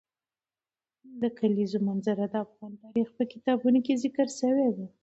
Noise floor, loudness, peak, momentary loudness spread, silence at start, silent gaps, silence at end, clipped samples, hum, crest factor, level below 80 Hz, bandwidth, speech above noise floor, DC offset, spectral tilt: under -90 dBFS; -28 LUFS; -12 dBFS; 8 LU; 1.05 s; none; 0.15 s; under 0.1%; none; 16 dB; -74 dBFS; 8.2 kHz; over 62 dB; under 0.1%; -6.5 dB/octave